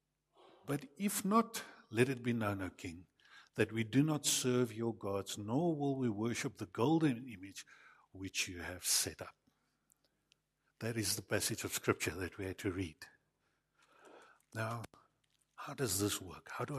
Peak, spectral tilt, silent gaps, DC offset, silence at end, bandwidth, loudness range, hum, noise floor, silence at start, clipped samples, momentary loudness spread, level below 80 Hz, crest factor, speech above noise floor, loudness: -16 dBFS; -4 dB/octave; none; under 0.1%; 0 s; 15 kHz; 7 LU; none; -81 dBFS; 0.65 s; under 0.1%; 17 LU; -70 dBFS; 22 dB; 44 dB; -37 LUFS